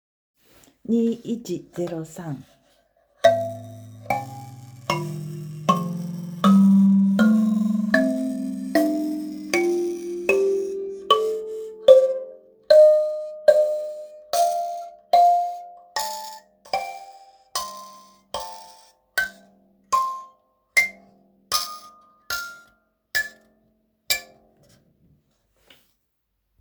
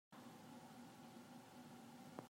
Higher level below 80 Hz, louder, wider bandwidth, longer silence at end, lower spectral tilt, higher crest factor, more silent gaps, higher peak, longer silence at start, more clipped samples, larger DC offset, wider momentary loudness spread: first, -64 dBFS vs under -90 dBFS; first, -22 LUFS vs -60 LUFS; first, over 20 kHz vs 16 kHz; first, 2.35 s vs 0 s; about the same, -5.5 dB/octave vs -5 dB/octave; about the same, 22 dB vs 24 dB; neither; first, 0 dBFS vs -34 dBFS; first, 0.9 s vs 0.1 s; neither; neither; first, 19 LU vs 1 LU